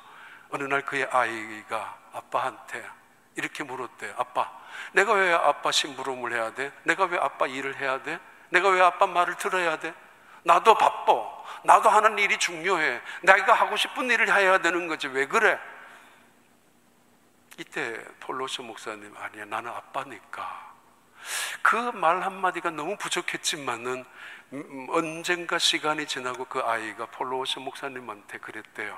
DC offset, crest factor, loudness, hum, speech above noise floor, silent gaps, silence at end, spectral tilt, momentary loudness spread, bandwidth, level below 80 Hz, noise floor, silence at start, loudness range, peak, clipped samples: under 0.1%; 26 dB; -25 LUFS; none; 36 dB; none; 0 s; -2 dB/octave; 18 LU; 16 kHz; -80 dBFS; -62 dBFS; 0.05 s; 13 LU; -2 dBFS; under 0.1%